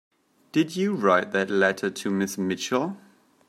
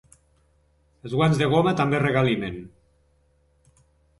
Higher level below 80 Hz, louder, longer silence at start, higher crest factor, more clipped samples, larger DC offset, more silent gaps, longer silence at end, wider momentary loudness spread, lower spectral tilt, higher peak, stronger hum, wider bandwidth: second, -74 dBFS vs -52 dBFS; second, -25 LUFS vs -22 LUFS; second, 0.55 s vs 1.05 s; about the same, 18 dB vs 18 dB; neither; neither; neither; second, 0.5 s vs 1.5 s; second, 7 LU vs 15 LU; second, -5 dB/octave vs -7 dB/octave; about the same, -6 dBFS vs -8 dBFS; neither; first, 15 kHz vs 11.5 kHz